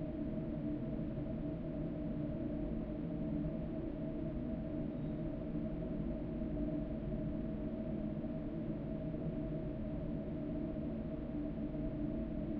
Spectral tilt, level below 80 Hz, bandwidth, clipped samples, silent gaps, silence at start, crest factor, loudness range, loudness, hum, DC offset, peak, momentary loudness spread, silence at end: -10 dB/octave; -48 dBFS; 4.9 kHz; under 0.1%; none; 0 s; 12 dB; 1 LU; -41 LUFS; none; under 0.1%; -28 dBFS; 2 LU; 0 s